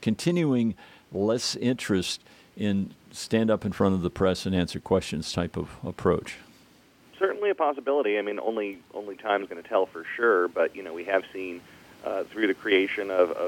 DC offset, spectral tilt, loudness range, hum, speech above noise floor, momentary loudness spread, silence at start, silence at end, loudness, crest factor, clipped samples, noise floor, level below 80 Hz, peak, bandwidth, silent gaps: under 0.1%; -5.5 dB/octave; 2 LU; none; 30 dB; 12 LU; 0 s; 0 s; -27 LUFS; 18 dB; under 0.1%; -57 dBFS; -56 dBFS; -8 dBFS; 16.5 kHz; none